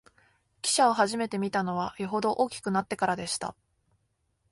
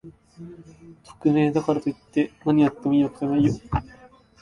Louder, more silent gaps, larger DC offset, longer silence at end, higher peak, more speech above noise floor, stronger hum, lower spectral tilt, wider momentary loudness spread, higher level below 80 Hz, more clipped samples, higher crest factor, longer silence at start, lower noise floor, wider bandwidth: second, -28 LUFS vs -23 LUFS; neither; neither; first, 1 s vs 0.6 s; second, -10 dBFS vs -6 dBFS; first, 47 dB vs 28 dB; neither; second, -3.5 dB/octave vs -8 dB/octave; second, 9 LU vs 20 LU; second, -66 dBFS vs -46 dBFS; neither; about the same, 18 dB vs 18 dB; first, 0.65 s vs 0.05 s; first, -75 dBFS vs -51 dBFS; first, 12 kHz vs 9.6 kHz